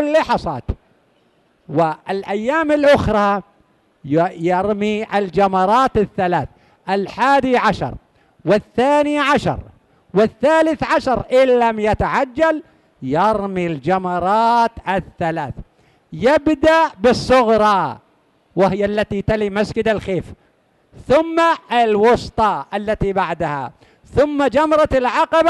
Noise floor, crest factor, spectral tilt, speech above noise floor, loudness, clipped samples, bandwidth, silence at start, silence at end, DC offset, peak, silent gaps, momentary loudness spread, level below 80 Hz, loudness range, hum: -58 dBFS; 12 dB; -6 dB/octave; 42 dB; -17 LUFS; under 0.1%; 12 kHz; 0 s; 0 s; under 0.1%; -4 dBFS; none; 11 LU; -40 dBFS; 2 LU; none